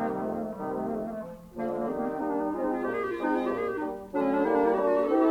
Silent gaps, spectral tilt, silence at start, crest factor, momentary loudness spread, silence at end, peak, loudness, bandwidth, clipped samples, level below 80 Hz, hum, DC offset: none; -7.5 dB/octave; 0 s; 16 dB; 9 LU; 0 s; -12 dBFS; -29 LUFS; 16.5 kHz; under 0.1%; -58 dBFS; none; under 0.1%